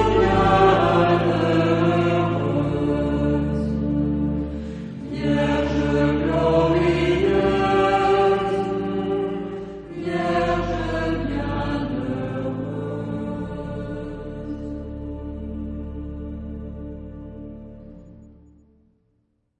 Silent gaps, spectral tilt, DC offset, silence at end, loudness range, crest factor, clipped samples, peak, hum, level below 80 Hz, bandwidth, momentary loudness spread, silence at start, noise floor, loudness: none; -7.5 dB/octave; under 0.1%; 1.25 s; 15 LU; 18 dB; under 0.1%; -4 dBFS; none; -36 dBFS; 9.4 kHz; 15 LU; 0 s; -68 dBFS; -22 LUFS